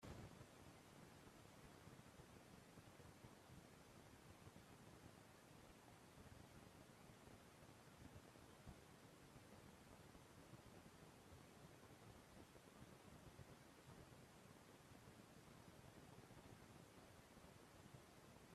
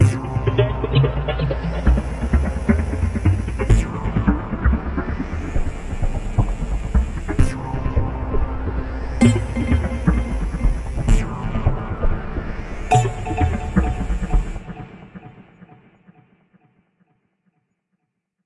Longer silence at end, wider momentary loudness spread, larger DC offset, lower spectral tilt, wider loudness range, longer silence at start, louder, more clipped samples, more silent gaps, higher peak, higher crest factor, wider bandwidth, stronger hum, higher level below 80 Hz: second, 0 s vs 2.8 s; second, 2 LU vs 9 LU; neither; second, -4.5 dB/octave vs -7 dB/octave; second, 0 LU vs 5 LU; about the same, 0 s vs 0 s; second, -65 LUFS vs -22 LUFS; neither; neither; second, -42 dBFS vs -2 dBFS; about the same, 22 dB vs 18 dB; first, 14.5 kHz vs 11.5 kHz; neither; second, -78 dBFS vs -24 dBFS